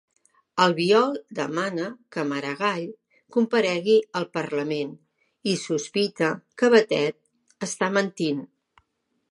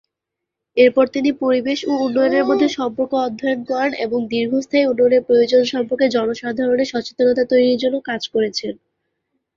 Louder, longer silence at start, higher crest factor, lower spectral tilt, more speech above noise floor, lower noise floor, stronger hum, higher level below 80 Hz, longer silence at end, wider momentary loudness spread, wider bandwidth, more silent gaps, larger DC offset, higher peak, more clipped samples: second, -24 LUFS vs -18 LUFS; second, 0.55 s vs 0.75 s; about the same, 20 dB vs 16 dB; about the same, -4.5 dB/octave vs -4.5 dB/octave; second, 51 dB vs 65 dB; second, -74 dBFS vs -82 dBFS; neither; second, -76 dBFS vs -60 dBFS; about the same, 0.85 s vs 0.85 s; first, 13 LU vs 8 LU; first, 11.5 kHz vs 7.4 kHz; neither; neither; second, -6 dBFS vs -2 dBFS; neither